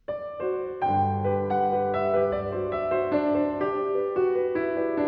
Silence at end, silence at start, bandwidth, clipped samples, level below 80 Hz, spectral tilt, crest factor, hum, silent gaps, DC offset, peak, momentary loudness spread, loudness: 0 s; 0.1 s; 5.2 kHz; under 0.1%; -56 dBFS; -10 dB/octave; 14 dB; none; none; under 0.1%; -12 dBFS; 5 LU; -26 LUFS